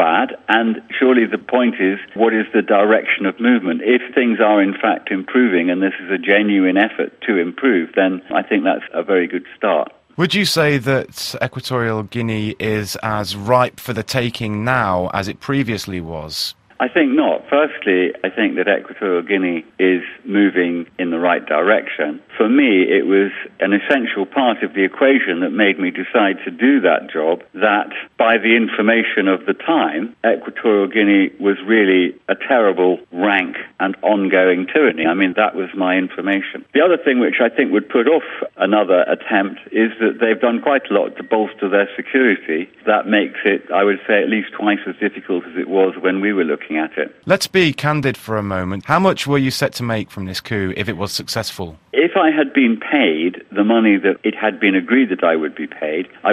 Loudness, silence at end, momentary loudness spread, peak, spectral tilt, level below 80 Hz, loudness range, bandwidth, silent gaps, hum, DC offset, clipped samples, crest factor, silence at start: -17 LUFS; 0 s; 8 LU; 0 dBFS; -5.5 dB/octave; -58 dBFS; 4 LU; 14 kHz; none; none; under 0.1%; under 0.1%; 16 dB; 0 s